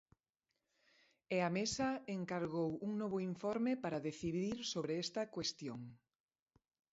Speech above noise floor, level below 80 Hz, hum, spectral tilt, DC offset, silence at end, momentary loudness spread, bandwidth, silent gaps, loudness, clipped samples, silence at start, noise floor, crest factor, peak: 50 dB; -72 dBFS; none; -4.5 dB/octave; under 0.1%; 0.95 s; 5 LU; 7.6 kHz; none; -40 LUFS; under 0.1%; 1.3 s; -90 dBFS; 18 dB; -24 dBFS